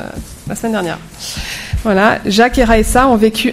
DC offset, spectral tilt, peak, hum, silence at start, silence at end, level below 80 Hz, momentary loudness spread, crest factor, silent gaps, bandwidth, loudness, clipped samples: under 0.1%; -4.5 dB/octave; 0 dBFS; none; 0 s; 0 s; -26 dBFS; 15 LU; 14 dB; none; 16 kHz; -13 LUFS; 0.2%